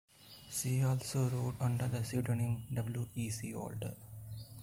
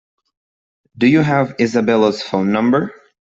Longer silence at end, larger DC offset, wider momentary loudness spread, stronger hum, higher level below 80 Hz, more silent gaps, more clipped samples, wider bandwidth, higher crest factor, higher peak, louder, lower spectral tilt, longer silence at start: second, 0 s vs 0.35 s; neither; first, 15 LU vs 5 LU; neither; about the same, -62 dBFS vs -58 dBFS; neither; neither; first, 16.5 kHz vs 7.8 kHz; about the same, 14 dB vs 14 dB; second, -22 dBFS vs -2 dBFS; second, -37 LUFS vs -15 LUFS; about the same, -6 dB/octave vs -7 dB/octave; second, 0.2 s vs 0.95 s